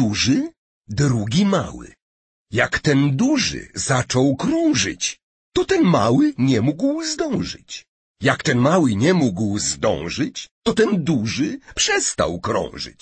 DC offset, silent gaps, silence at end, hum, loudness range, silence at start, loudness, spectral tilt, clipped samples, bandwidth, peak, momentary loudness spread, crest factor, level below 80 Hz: under 0.1%; 0.57-0.81 s, 2.02-2.46 s, 5.23-5.52 s, 7.88-8.15 s, 10.51-10.62 s; 0.1 s; none; 2 LU; 0 s; -19 LUFS; -4.5 dB/octave; under 0.1%; 8.8 kHz; -2 dBFS; 9 LU; 16 dB; -46 dBFS